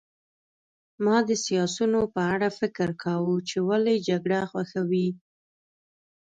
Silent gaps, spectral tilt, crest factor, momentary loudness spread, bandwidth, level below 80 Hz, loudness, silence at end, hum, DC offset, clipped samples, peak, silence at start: none; -5.5 dB/octave; 14 dB; 6 LU; 9.2 kHz; -62 dBFS; -26 LUFS; 1.05 s; none; under 0.1%; under 0.1%; -12 dBFS; 1 s